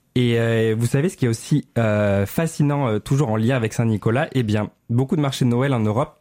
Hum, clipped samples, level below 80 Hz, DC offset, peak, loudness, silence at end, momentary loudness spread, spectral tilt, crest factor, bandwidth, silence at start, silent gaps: none; under 0.1%; -52 dBFS; under 0.1%; -6 dBFS; -20 LUFS; 0.1 s; 4 LU; -7 dB/octave; 12 dB; 16 kHz; 0.15 s; none